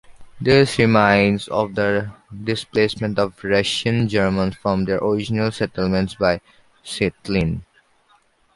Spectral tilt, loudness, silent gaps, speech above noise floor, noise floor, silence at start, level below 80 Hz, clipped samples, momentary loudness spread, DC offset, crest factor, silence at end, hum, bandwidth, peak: -6 dB/octave; -20 LUFS; none; 40 dB; -59 dBFS; 0.1 s; -44 dBFS; under 0.1%; 10 LU; under 0.1%; 18 dB; 0.95 s; none; 11.5 kHz; -2 dBFS